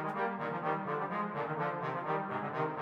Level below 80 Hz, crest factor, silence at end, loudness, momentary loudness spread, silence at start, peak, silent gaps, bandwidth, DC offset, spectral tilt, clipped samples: -80 dBFS; 16 dB; 0 s; -36 LUFS; 1 LU; 0 s; -20 dBFS; none; 8.8 kHz; under 0.1%; -8 dB/octave; under 0.1%